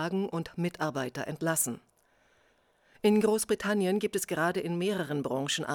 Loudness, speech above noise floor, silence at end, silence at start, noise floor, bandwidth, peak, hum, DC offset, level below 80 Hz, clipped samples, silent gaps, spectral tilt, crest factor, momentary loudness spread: -30 LUFS; 38 dB; 0 s; 0 s; -67 dBFS; over 20 kHz; -14 dBFS; none; under 0.1%; -68 dBFS; under 0.1%; none; -4.5 dB/octave; 16 dB; 8 LU